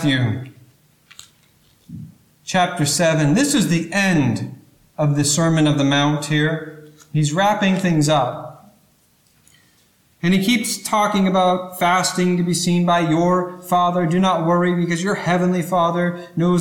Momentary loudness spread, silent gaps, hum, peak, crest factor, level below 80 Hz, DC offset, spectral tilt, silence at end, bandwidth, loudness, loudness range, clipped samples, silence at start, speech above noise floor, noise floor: 9 LU; none; none; -6 dBFS; 12 dB; -54 dBFS; under 0.1%; -5 dB/octave; 0 s; 17.5 kHz; -18 LUFS; 4 LU; under 0.1%; 0 s; 40 dB; -58 dBFS